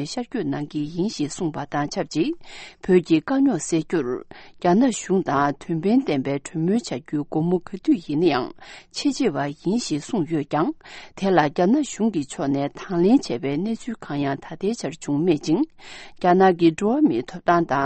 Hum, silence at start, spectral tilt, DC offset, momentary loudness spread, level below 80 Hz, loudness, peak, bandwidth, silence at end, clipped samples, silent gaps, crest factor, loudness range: none; 0 s; -6 dB/octave; under 0.1%; 9 LU; -54 dBFS; -22 LUFS; -4 dBFS; 8.8 kHz; 0 s; under 0.1%; none; 18 dB; 3 LU